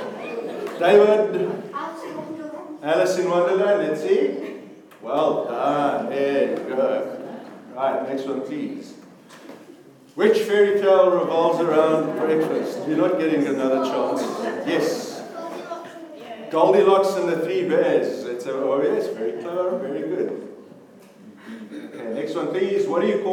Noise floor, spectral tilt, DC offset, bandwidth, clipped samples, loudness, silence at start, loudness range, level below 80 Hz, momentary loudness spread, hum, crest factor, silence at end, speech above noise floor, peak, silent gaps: -47 dBFS; -5.5 dB/octave; under 0.1%; 15 kHz; under 0.1%; -21 LUFS; 0 s; 8 LU; -82 dBFS; 18 LU; none; 20 dB; 0 s; 27 dB; -2 dBFS; none